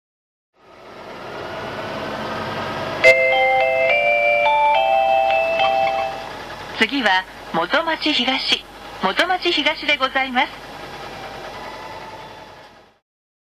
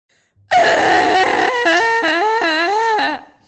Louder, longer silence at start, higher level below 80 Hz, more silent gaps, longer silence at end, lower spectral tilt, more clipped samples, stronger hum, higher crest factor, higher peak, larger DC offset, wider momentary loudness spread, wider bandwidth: second, -18 LUFS vs -14 LUFS; first, 0.75 s vs 0.5 s; about the same, -52 dBFS vs -56 dBFS; neither; first, 0.85 s vs 0.25 s; about the same, -3.5 dB/octave vs -2.5 dB/octave; neither; neither; first, 18 dB vs 12 dB; about the same, -2 dBFS vs -4 dBFS; neither; first, 18 LU vs 4 LU; first, 14 kHz vs 8.8 kHz